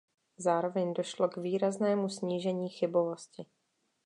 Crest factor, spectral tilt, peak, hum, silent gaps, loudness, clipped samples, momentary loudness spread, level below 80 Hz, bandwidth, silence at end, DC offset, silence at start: 18 dB; -6 dB/octave; -16 dBFS; none; none; -32 LUFS; under 0.1%; 6 LU; -86 dBFS; 11 kHz; 0.6 s; under 0.1%; 0.4 s